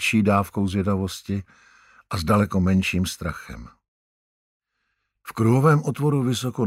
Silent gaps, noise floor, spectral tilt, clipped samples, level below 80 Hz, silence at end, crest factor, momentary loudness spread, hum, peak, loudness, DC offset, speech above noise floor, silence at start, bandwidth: 3.88-4.60 s; -76 dBFS; -6.5 dB/octave; under 0.1%; -48 dBFS; 0 s; 18 dB; 16 LU; none; -6 dBFS; -22 LUFS; under 0.1%; 54 dB; 0 s; 16 kHz